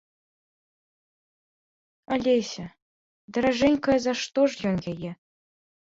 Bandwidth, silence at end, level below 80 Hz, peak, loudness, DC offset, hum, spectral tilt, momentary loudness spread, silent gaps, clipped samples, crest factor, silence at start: 7.8 kHz; 0.7 s; -58 dBFS; -10 dBFS; -25 LUFS; under 0.1%; none; -5 dB/octave; 14 LU; 2.82-3.28 s; under 0.1%; 18 dB; 2.1 s